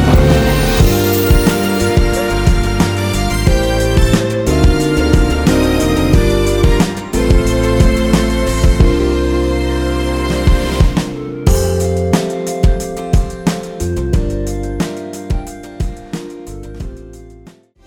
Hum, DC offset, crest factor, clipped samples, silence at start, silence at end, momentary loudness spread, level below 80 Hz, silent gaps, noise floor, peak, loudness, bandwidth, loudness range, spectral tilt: none; under 0.1%; 12 dB; under 0.1%; 0 s; 0.45 s; 11 LU; -16 dBFS; none; -41 dBFS; 0 dBFS; -14 LUFS; over 20 kHz; 8 LU; -6 dB/octave